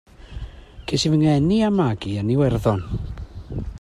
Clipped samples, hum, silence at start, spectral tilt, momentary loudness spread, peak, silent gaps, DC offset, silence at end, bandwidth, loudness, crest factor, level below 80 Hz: under 0.1%; none; 0.2 s; -6.5 dB/octave; 20 LU; -6 dBFS; none; under 0.1%; 0 s; 12.5 kHz; -20 LUFS; 16 dB; -36 dBFS